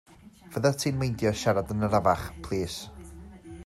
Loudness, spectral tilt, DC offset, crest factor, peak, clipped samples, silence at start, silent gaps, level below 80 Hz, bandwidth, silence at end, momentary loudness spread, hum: -28 LUFS; -5.5 dB/octave; under 0.1%; 20 dB; -10 dBFS; under 0.1%; 0.25 s; none; -50 dBFS; 16 kHz; 0.05 s; 21 LU; none